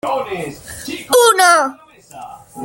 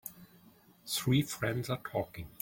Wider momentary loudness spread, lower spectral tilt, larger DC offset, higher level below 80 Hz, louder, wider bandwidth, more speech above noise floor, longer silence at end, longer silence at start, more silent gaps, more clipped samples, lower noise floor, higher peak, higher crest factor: first, 25 LU vs 15 LU; second, -1.5 dB/octave vs -5 dB/octave; neither; first, -54 dBFS vs -62 dBFS; first, -13 LUFS vs -34 LUFS; about the same, 17 kHz vs 17 kHz; second, 19 dB vs 28 dB; about the same, 0 s vs 0.1 s; about the same, 0.05 s vs 0.05 s; neither; neither; second, -36 dBFS vs -61 dBFS; first, 0 dBFS vs -18 dBFS; about the same, 16 dB vs 18 dB